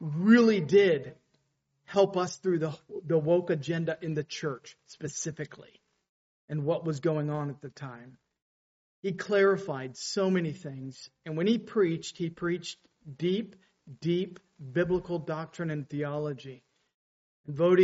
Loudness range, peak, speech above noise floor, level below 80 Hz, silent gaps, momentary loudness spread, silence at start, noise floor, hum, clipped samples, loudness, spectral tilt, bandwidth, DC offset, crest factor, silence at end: 6 LU; -8 dBFS; 48 dB; -68 dBFS; 6.09-6.48 s, 8.42-9.03 s, 16.94-17.44 s; 19 LU; 0 s; -76 dBFS; none; under 0.1%; -29 LUFS; -6 dB/octave; 8 kHz; under 0.1%; 20 dB; 0 s